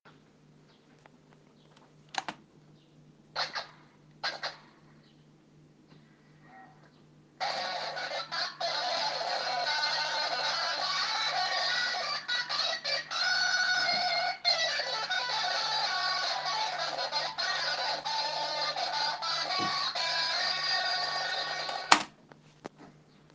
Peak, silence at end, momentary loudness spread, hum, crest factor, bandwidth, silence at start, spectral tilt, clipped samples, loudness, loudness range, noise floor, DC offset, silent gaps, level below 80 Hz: 0 dBFS; 0.45 s; 10 LU; none; 34 dB; 10 kHz; 0.05 s; -0.5 dB/octave; under 0.1%; -30 LUFS; 13 LU; -60 dBFS; under 0.1%; none; -80 dBFS